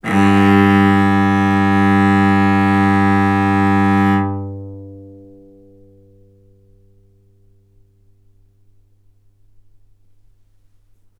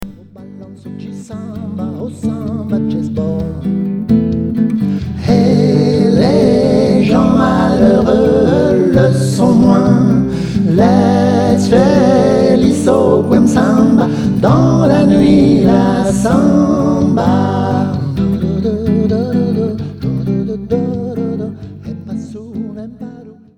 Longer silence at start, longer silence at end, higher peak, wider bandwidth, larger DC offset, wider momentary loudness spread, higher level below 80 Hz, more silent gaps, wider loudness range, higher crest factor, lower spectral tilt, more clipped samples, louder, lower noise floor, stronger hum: about the same, 0.05 s vs 0 s; first, 6.1 s vs 0.25 s; about the same, 0 dBFS vs 0 dBFS; about the same, 11 kHz vs 12 kHz; neither; about the same, 16 LU vs 15 LU; second, -56 dBFS vs -34 dBFS; neither; about the same, 11 LU vs 9 LU; first, 16 dB vs 10 dB; about the same, -7.5 dB/octave vs -7.5 dB/octave; neither; about the same, -13 LUFS vs -12 LUFS; first, -52 dBFS vs -34 dBFS; neither